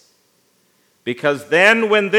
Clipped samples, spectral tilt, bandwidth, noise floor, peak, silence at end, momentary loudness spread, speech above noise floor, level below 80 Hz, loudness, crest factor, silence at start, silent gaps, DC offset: under 0.1%; -4 dB/octave; 15.5 kHz; -60 dBFS; 0 dBFS; 0 s; 16 LU; 45 dB; -78 dBFS; -15 LUFS; 18 dB; 1.05 s; none; under 0.1%